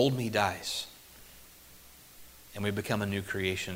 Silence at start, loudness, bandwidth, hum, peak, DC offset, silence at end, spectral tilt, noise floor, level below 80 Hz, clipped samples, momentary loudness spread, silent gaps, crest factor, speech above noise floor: 0 s; -32 LUFS; 16 kHz; none; -10 dBFS; under 0.1%; 0 s; -4.5 dB/octave; -54 dBFS; -60 dBFS; under 0.1%; 23 LU; none; 22 dB; 23 dB